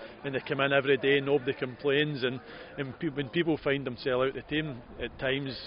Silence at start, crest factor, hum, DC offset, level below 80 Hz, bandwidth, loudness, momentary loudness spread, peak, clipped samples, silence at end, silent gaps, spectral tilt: 0 s; 20 dB; none; under 0.1%; -56 dBFS; 5.4 kHz; -30 LUFS; 13 LU; -10 dBFS; under 0.1%; 0 s; none; -3.5 dB/octave